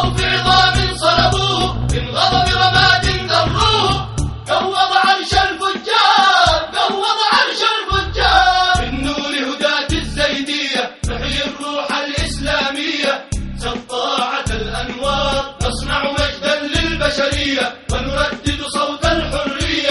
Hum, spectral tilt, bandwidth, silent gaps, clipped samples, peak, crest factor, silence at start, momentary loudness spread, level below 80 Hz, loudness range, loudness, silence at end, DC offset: none; -3.5 dB/octave; 11.5 kHz; none; under 0.1%; 0 dBFS; 16 dB; 0 s; 9 LU; -28 dBFS; 6 LU; -16 LUFS; 0 s; under 0.1%